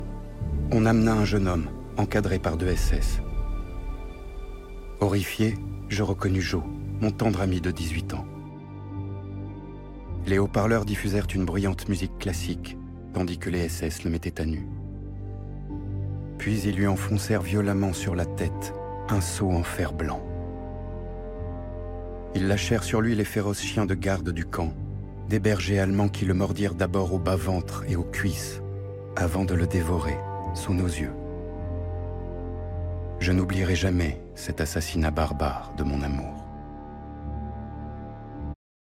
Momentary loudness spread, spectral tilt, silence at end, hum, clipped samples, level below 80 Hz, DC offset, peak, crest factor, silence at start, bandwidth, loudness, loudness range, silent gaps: 14 LU; -6 dB/octave; 0.45 s; none; under 0.1%; -36 dBFS; under 0.1%; -10 dBFS; 18 dB; 0 s; 16 kHz; -28 LUFS; 5 LU; none